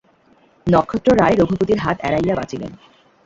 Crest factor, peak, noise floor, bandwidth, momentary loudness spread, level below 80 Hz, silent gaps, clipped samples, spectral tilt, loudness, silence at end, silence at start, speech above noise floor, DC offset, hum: 16 dB; -2 dBFS; -54 dBFS; 7.8 kHz; 14 LU; -44 dBFS; none; under 0.1%; -7.5 dB/octave; -17 LUFS; 0.5 s; 0.65 s; 37 dB; under 0.1%; none